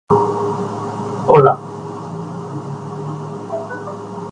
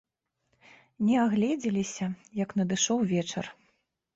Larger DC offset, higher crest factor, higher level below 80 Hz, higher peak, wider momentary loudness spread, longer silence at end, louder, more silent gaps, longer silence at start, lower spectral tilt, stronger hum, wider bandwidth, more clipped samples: neither; about the same, 18 dB vs 16 dB; first, -52 dBFS vs -66 dBFS; first, 0 dBFS vs -14 dBFS; first, 17 LU vs 10 LU; second, 0 s vs 0.65 s; first, -19 LUFS vs -28 LUFS; neither; second, 0.1 s vs 1 s; first, -8 dB/octave vs -4.5 dB/octave; neither; first, 10 kHz vs 8 kHz; neither